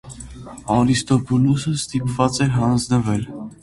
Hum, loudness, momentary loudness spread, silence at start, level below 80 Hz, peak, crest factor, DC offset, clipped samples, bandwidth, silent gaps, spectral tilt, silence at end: none; -19 LUFS; 17 LU; 0.05 s; -44 dBFS; -2 dBFS; 18 dB; under 0.1%; under 0.1%; 11.5 kHz; none; -6 dB/octave; 0.1 s